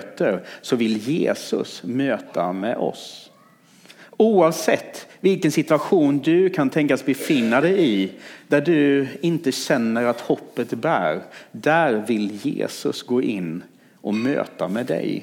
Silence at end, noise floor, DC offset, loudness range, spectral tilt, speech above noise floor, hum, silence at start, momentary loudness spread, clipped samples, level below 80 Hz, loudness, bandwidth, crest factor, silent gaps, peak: 0 s; -53 dBFS; under 0.1%; 5 LU; -5.5 dB/octave; 32 dB; none; 0 s; 10 LU; under 0.1%; -74 dBFS; -21 LUFS; 18 kHz; 18 dB; none; -4 dBFS